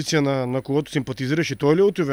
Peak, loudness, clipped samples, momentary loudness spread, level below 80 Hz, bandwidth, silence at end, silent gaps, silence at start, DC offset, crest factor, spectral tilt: -6 dBFS; -22 LUFS; under 0.1%; 7 LU; -56 dBFS; 14.5 kHz; 0 s; none; 0 s; under 0.1%; 16 dB; -5.5 dB/octave